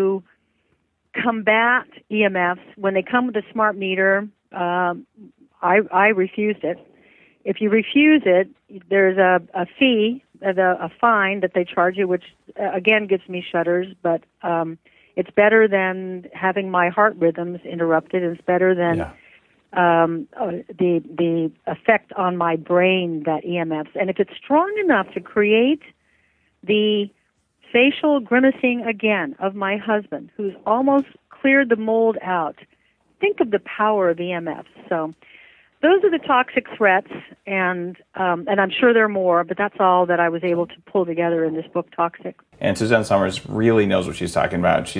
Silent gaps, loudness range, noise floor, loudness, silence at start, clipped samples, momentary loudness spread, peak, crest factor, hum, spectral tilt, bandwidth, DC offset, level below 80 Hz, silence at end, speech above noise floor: none; 3 LU; -67 dBFS; -19 LUFS; 0 s; under 0.1%; 11 LU; -2 dBFS; 18 dB; none; -6 dB/octave; 10.5 kHz; under 0.1%; -58 dBFS; 0 s; 48 dB